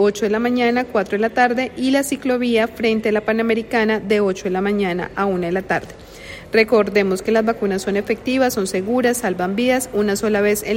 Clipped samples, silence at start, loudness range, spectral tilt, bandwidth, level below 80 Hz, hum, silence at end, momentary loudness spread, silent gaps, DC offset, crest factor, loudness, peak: under 0.1%; 0 s; 1 LU; -4.5 dB/octave; 16.5 kHz; -48 dBFS; none; 0 s; 4 LU; none; under 0.1%; 16 dB; -19 LUFS; -2 dBFS